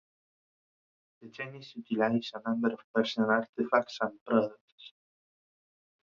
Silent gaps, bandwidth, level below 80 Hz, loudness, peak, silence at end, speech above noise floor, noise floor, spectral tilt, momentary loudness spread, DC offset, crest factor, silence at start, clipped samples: 2.84-2.94 s, 3.49-3.53 s, 4.21-4.26 s, 4.61-4.78 s; 7.2 kHz; -78 dBFS; -31 LUFS; -10 dBFS; 1.15 s; over 59 dB; under -90 dBFS; -6 dB/octave; 13 LU; under 0.1%; 24 dB; 1.2 s; under 0.1%